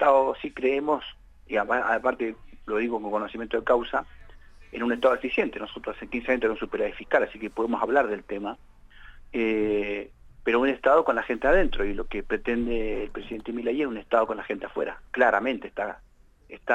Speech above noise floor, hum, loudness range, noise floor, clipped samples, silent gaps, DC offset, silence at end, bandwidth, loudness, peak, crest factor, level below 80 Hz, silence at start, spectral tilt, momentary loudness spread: 23 dB; none; 3 LU; -49 dBFS; under 0.1%; none; under 0.1%; 0 s; 8.8 kHz; -26 LUFS; -8 dBFS; 18 dB; -42 dBFS; 0 s; -6 dB/octave; 12 LU